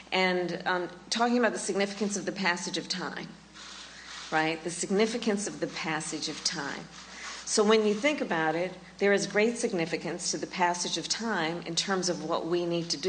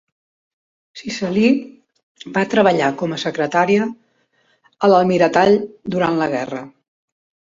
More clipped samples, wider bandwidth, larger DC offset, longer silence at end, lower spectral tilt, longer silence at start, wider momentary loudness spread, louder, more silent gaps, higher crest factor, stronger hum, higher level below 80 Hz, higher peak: neither; first, 9.6 kHz vs 7.8 kHz; neither; second, 0 s vs 0.85 s; second, -3 dB/octave vs -6 dB/octave; second, 0 s vs 0.95 s; about the same, 13 LU vs 12 LU; second, -29 LUFS vs -17 LUFS; second, none vs 2.03-2.15 s; about the same, 20 dB vs 18 dB; neither; second, -66 dBFS vs -60 dBFS; second, -10 dBFS vs -2 dBFS